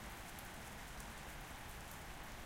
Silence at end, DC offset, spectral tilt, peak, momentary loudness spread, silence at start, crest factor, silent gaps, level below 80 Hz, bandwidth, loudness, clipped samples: 0 s; under 0.1%; -3 dB/octave; -32 dBFS; 1 LU; 0 s; 18 dB; none; -56 dBFS; 16.5 kHz; -51 LUFS; under 0.1%